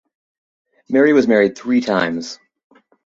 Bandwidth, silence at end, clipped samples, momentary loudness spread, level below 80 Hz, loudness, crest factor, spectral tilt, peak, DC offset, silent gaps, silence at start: 7.8 kHz; 0.7 s; under 0.1%; 16 LU; -60 dBFS; -16 LUFS; 16 dB; -5.5 dB/octave; -2 dBFS; under 0.1%; none; 0.9 s